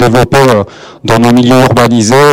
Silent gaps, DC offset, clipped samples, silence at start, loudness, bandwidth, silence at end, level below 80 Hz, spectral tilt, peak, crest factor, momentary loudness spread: none; under 0.1%; under 0.1%; 0 s; -6 LUFS; 17 kHz; 0 s; -32 dBFS; -5.5 dB/octave; 0 dBFS; 6 dB; 7 LU